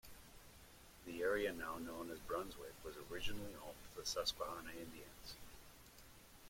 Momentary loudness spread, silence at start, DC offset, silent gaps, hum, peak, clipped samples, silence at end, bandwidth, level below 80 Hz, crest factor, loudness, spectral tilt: 20 LU; 0.05 s; under 0.1%; none; none; -28 dBFS; under 0.1%; 0 s; 16.5 kHz; -62 dBFS; 20 dB; -46 LUFS; -3 dB/octave